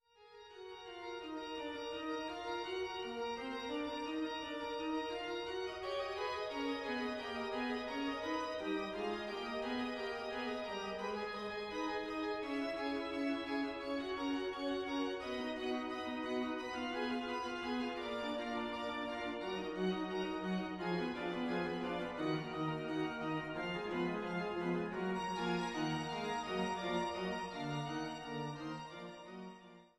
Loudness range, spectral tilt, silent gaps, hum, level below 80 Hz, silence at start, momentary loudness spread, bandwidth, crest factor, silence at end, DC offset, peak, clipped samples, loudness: 2 LU; -5.5 dB/octave; none; none; -68 dBFS; 0.2 s; 5 LU; 13 kHz; 14 dB; 0.1 s; under 0.1%; -26 dBFS; under 0.1%; -40 LUFS